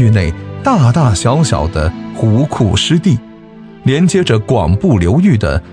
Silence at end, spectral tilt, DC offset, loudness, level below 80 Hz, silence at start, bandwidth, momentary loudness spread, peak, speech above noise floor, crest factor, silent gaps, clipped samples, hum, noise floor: 0 s; -6 dB/octave; under 0.1%; -12 LUFS; -28 dBFS; 0 s; 10.5 kHz; 7 LU; 0 dBFS; 23 dB; 12 dB; none; under 0.1%; none; -34 dBFS